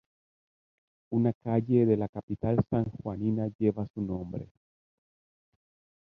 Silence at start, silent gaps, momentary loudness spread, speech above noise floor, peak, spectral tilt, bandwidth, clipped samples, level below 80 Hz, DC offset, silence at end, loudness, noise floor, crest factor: 1.1 s; 1.35-1.41 s, 2.09-2.13 s, 2.23-2.28 s, 3.55-3.59 s, 3.90-3.94 s; 11 LU; over 61 dB; -12 dBFS; -12 dB/octave; 4.1 kHz; under 0.1%; -56 dBFS; under 0.1%; 1.6 s; -30 LUFS; under -90 dBFS; 18 dB